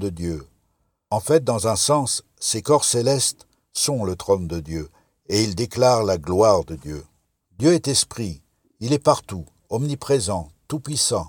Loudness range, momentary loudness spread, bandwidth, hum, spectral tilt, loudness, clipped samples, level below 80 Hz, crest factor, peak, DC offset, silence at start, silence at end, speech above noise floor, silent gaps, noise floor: 3 LU; 15 LU; 19 kHz; none; -4 dB/octave; -21 LUFS; under 0.1%; -48 dBFS; 20 dB; -2 dBFS; under 0.1%; 0 s; 0 s; 48 dB; none; -69 dBFS